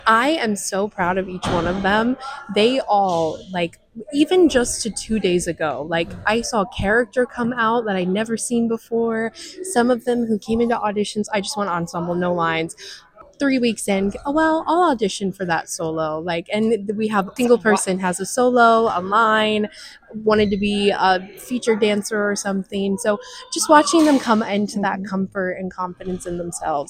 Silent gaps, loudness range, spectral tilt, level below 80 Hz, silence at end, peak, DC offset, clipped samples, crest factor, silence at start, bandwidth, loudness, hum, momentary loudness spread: none; 4 LU; -4.5 dB/octave; -46 dBFS; 0.05 s; 0 dBFS; under 0.1%; under 0.1%; 20 dB; 0.05 s; 16 kHz; -20 LUFS; none; 10 LU